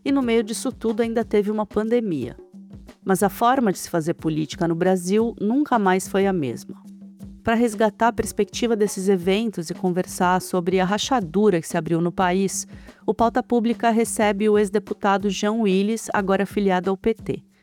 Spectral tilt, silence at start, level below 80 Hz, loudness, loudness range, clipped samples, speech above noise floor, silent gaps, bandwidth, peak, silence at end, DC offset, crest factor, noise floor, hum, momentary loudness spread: -5.5 dB/octave; 0.05 s; -50 dBFS; -22 LUFS; 2 LU; under 0.1%; 21 dB; none; 18 kHz; -6 dBFS; 0.25 s; under 0.1%; 14 dB; -42 dBFS; none; 8 LU